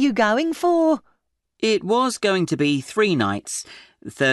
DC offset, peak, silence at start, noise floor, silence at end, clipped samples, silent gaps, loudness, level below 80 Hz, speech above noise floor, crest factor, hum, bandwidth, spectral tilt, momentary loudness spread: under 0.1%; -6 dBFS; 0 s; -68 dBFS; 0 s; under 0.1%; none; -21 LUFS; -62 dBFS; 48 dB; 16 dB; none; 12 kHz; -4.5 dB/octave; 11 LU